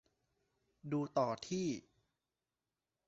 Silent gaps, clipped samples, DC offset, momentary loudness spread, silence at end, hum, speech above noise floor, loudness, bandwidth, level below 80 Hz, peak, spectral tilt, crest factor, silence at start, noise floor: none; under 0.1%; under 0.1%; 10 LU; 1.3 s; none; over 52 dB; -39 LUFS; 8 kHz; -78 dBFS; -22 dBFS; -6 dB/octave; 22 dB; 0.85 s; under -90 dBFS